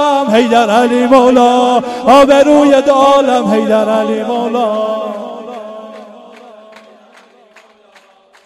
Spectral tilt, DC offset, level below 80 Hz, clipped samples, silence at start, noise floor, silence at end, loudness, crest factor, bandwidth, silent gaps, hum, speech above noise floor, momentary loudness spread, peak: -4.5 dB/octave; under 0.1%; -48 dBFS; under 0.1%; 0 s; -45 dBFS; 2.25 s; -10 LUFS; 12 dB; 13 kHz; none; none; 36 dB; 19 LU; 0 dBFS